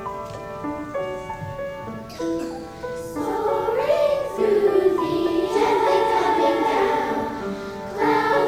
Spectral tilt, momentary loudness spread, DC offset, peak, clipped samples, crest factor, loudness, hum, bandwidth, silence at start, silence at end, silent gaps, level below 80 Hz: -5.5 dB/octave; 13 LU; under 0.1%; -6 dBFS; under 0.1%; 16 dB; -22 LUFS; none; 16 kHz; 0 s; 0 s; none; -50 dBFS